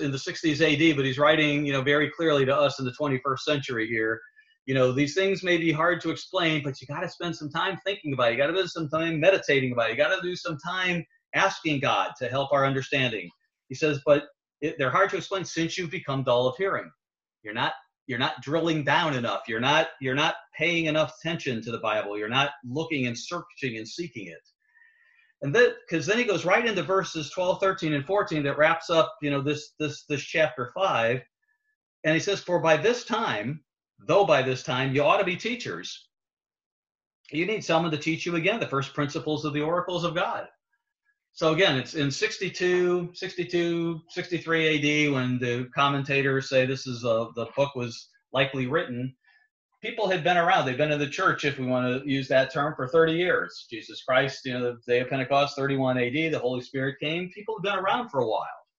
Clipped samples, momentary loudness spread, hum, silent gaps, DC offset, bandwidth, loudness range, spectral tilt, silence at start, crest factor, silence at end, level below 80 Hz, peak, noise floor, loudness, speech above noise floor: under 0.1%; 10 LU; none; 4.59-4.65 s, 18.01-18.06 s, 31.75-32.03 s, 36.66-36.83 s, 36.95-36.99 s, 37.07-37.24 s, 49.51-49.69 s; under 0.1%; 8 kHz; 4 LU; -5 dB/octave; 0 s; 20 dB; 0.2 s; -64 dBFS; -6 dBFS; -79 dBFS; -26 LUFS; 53 dB